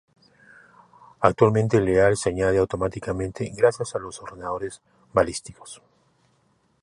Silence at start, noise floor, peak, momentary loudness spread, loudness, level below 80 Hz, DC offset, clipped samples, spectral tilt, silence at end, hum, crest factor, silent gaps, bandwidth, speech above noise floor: 1.2 s; -65 dBFS; -2 dBFS; 16 LU; -23 LUFS; -48 dBFS; under 0.1%; under 0.1%; -6 dB/octave; 1.1 s; none; 24 dB; none; 11.5 kHz; 43 dB